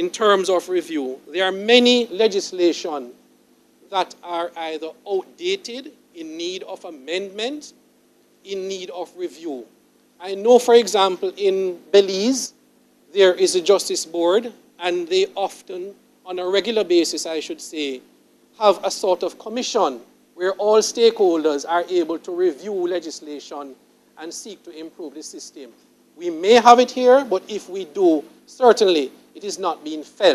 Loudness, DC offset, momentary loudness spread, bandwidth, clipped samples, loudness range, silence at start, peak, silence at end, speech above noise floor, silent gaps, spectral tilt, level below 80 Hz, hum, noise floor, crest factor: -19 LUFS; under 0.1%; 19 LU; 14 kHz; under 0.1%; 12 LU; 0 s; 0 dBFS; 0 s; 38 dB; none; -3 dB/octave; -74 dBFS; none; -57 dBFS; 20 dB